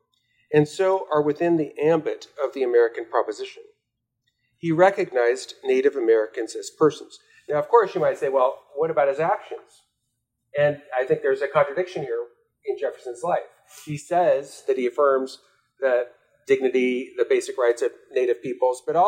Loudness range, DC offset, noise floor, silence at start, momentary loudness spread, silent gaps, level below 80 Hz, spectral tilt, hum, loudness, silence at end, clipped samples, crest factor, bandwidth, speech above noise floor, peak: 3 LU; under 0.1%; -79 dBFS; 0.5 s; 12 LU; none; -74 dBFS; -5.5 dB/octave; none; -23 LUFS; 0 s; under 0.1%; 20 dB; 14 kHz; 57 dB; -4 dBFS